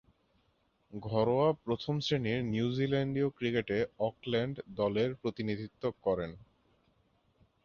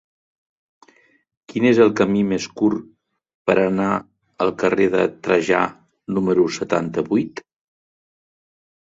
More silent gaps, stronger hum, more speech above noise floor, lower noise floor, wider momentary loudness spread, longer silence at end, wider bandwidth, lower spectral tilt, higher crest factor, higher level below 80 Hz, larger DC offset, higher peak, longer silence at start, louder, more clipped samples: second, none vs 3.34-3.45 s; neither; about the same, 41 dB vs 39 dB; first, -74 dBFS vs -57 dBFS; second, 7 LU vs 11 LU; second, 1.25 s vs 1.45 s; second, 7.2 kHz vs 8 kHz; about the same, -7 dB/octave vs -6 dB/octave; about the same, 18 dB vs 20 dB; about the same, -62 dBFS vs -58 dBFS; neither; second, -16 dBFS vs -2 dBFS; second, 0.9 s vs 1.55 s; second, -33 LUFS vs -19 LUFS; neither